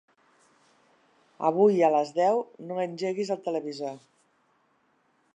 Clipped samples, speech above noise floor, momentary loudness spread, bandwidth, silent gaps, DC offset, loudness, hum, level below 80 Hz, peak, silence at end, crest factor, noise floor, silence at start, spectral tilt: under 0.1%; 43 dB; 14 LU; 9.4 kHz; none; under 0.1%; -27 LUFS; none; -86 dBFS; -10 dBFS; 1.4 s; 20 dB; -69 dBFS; 1.4 s; -6.5 dB/octave